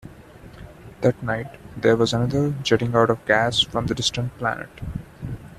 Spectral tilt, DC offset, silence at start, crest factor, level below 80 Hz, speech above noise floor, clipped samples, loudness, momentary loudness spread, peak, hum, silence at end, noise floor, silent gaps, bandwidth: -5 dB/octave; under 0.1%; 0.05 s; 22 dB; -46 dBFS; 22 dB; under 0.1%; -22 LUFS; 16 LU; -2 dBFS; none; 0.05 s; -44 dBFS; none; 13.5 kHz